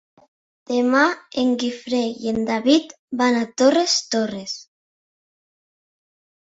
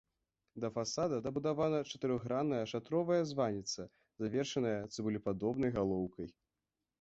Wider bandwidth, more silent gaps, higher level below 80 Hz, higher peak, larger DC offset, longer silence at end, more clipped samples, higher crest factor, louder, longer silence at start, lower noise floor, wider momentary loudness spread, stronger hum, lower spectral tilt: about the same, 8 kHz vs 8 kHz; first, 2.99-3.08 s vs none; about the same, -62 dBFS vs -66 dBFS; first, -2 dBFS vs -20 dBFS; neither; first, 1.85 s vs 0.7 s; neither; about the same, 20 dB vs 16 dB; first, -20 LUFS vs -37 LUFS; first, 0.7 s vs 0.55 s; about the same, under -90 dBFS vs under -90 dBFS; about the same, 9 LU vs 9 LU; neither; second, -3 dB/octave vs -6 dB/octave